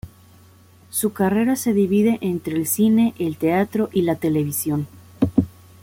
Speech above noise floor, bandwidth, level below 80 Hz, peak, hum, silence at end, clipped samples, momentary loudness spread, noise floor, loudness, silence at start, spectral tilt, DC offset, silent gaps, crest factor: 30 dB; 17 kHz; -52 dBFS; -4 dBFS; none; 0.35 s; under 0.1%; 7 LU; -50 dBFS; -20 LUFS; 0.05 s; -6 dB/octave; under 0.1%; none; 18 dB